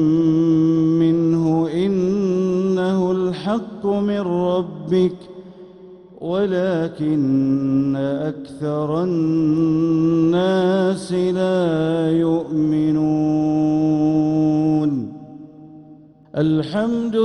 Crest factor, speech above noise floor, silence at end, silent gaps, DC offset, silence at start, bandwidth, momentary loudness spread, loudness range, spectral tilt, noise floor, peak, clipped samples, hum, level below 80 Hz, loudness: 12 dB; 27 dB; 0 s; none; under 0.1%; 0 s; 10.5 kHz; 7 LU; 4 LU; -8.5 dB/octave; -45 dBFS; -6 dBFS; under 0.1%; none; -54 dBFS; -19 LUFS